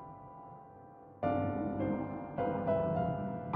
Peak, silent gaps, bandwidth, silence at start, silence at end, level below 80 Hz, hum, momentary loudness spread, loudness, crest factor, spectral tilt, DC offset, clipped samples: -20 dBFS; none; 4.5 kHz; 0 s; 0 s; -62 dBFS; none; 20 LU; -35 LUFS; 16 dB; -8.5 dB/octave; under 0.1%; under 0.1%